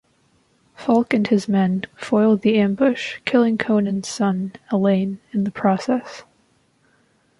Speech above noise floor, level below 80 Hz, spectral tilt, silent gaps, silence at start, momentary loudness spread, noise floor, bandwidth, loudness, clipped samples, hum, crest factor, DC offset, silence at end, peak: 42 dB; -62 dBFS; -6.5 dB/octave; none; 0.8 s; 8 LU; -61 dBFS; 11.5 kHz; -20 LUFS; under 0.1%; none; 16 dB; under 0.1%; 1.15 s; -4 dBFS